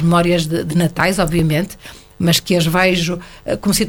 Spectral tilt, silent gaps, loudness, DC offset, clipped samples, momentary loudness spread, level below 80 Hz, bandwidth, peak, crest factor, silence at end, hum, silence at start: -5 dB/octave; none; -16 LUFS; under 0.1%; under 0.1%; 10 LU; -36 dBFS; 19 kHz; 0 dBFS; 16 dB; 0 s; none; 0 s